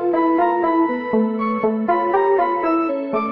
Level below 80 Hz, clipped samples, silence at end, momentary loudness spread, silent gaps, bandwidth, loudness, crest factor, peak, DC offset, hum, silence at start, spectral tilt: -56 dBFS; under 0.1%; 0 s; 3 LU; none; 5.2 kHz; -19 LUFS; 12 dB; -6 dBFS; 0.1%; none; 0 s; -9 dB/octave